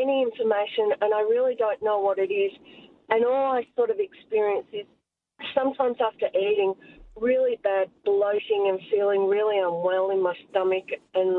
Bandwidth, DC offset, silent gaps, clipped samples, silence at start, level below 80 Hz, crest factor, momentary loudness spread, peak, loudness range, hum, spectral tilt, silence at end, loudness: 4.1 kHz; under 0.1%; none; under 0.1%; 0 s; -66 dBFS; 18 dB; 6 LU; -6 dBFS; 3 LU; none; -7.5 dB/octave; 0 s; -25 LUFS